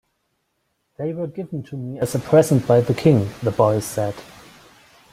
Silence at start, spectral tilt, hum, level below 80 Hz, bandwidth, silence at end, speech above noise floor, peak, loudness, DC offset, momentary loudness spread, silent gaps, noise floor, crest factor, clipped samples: 1 s; -7 dB/octave; none; -54 dBFS; 16 kHz; 0.9 s; 52 dB; -2 dBFS; -20 LUFS; under 0.1%; 14 LU; none; -71 dBFS; 18 dB; under 0.1%